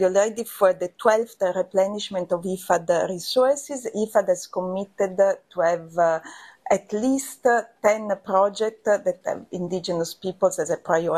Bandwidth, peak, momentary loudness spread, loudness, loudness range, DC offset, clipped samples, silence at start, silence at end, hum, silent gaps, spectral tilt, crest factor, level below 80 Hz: 14.5 kHz; -4 dBFS; 7 LU; -23 LUFS; 1 LU; under 0.1%; under 0.1%; 0 s; 0 s; none; none; -4.5 dB/octave; 20 dB; -66 dBFS